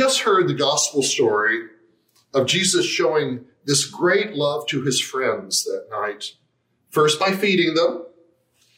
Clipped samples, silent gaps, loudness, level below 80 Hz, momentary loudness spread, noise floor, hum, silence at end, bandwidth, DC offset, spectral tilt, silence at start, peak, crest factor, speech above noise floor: under 0.1%; none; -20 LUFS; -70 dBFS; 10 LU; -67 dBFS; none; 0.7 s; 16 kHz; under 0.1%; -3 dB/octave; 0 s; -4 dBFS; 16 dB; 47 dB